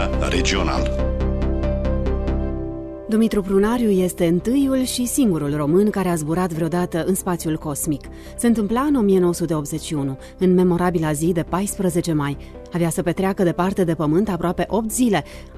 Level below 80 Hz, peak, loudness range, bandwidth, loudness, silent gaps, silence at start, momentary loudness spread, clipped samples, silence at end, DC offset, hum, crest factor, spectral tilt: -30 dBFS; -6 dBFS; 2 LU; 14 kHz; -20 LUFS; none; 0 s; 7 LU; under 0.1%; 0 s; under 0.1%; none; 14 dB; -6 dB/octave